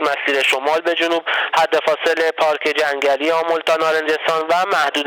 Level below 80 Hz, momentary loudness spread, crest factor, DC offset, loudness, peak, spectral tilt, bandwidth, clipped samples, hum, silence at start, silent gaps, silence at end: -70 dBFS; 2 LU; 14 dB; under 0.1%; -17 LUFS; -4 dBFS; -2 dB/octave; 19.5 kHz; under 0.1%; none; 0 s; none; 0 s